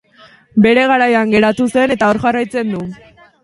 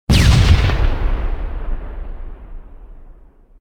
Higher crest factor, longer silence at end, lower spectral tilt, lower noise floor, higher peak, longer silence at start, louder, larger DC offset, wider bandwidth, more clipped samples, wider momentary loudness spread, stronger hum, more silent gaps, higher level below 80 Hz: about the same, 14 dB vs 16 dB; about the same, 0.5 s vs 0.5 s; about the same, -6 dB/octave vs -5.5 dB/octave; about the same, -45 dBFS vs -43 dBFS; about the same, 0 dBFS vs 0 dBFS; first, 0.55 s vs 0.1 s; first, -13 LUFS vs -17 LUFS; neither; second, 11.5 kHz vs 16.5 kHz; neither; second, 10 LU vs 24 LU; neither; neither; second, -48 dBFS vs -18 dBFS